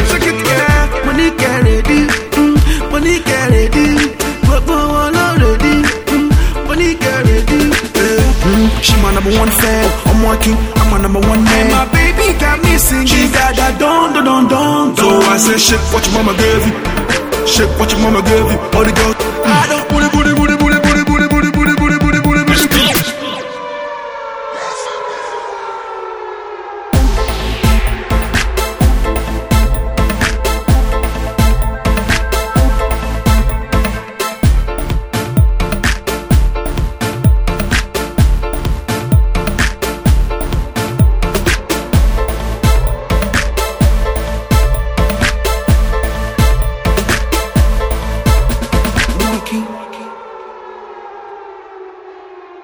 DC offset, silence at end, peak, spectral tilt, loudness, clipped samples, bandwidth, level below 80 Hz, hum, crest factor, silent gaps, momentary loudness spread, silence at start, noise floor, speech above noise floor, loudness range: under 0.1%; 0 s; 0 dBFS; -4.5 dB/octave; -13 LUFS; under 0.1%; over 20 kHz; -16 dBFS; none; 12 dB; none; 11 LU; 0 s; -34 dBFS; 23 dB; 6 LU